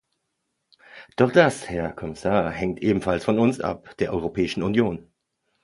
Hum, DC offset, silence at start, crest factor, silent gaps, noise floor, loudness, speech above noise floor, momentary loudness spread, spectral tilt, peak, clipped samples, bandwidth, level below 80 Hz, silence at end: none; under 0.1%; 0.95 s; 22 dB; none; -77 dBFS; -23 LUFS; 55 dB; 11 LU; -6.5 dB/octave; -2 dBFS; under 0.1%; 11.5 kHz; -48 dBFS; 0.65 s